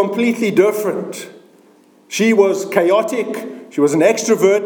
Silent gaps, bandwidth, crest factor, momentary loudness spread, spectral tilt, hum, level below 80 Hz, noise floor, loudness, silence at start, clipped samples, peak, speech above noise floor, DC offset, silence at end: none; over 20 kHz; 16 dB; 13 LU; -4.5 dB/octave; none; -70 dBFS; -49 dBFS; -16 LUFS; 0 s; under 0.1%; 0 dBFS; 34 dB; under 0.1%; 0 s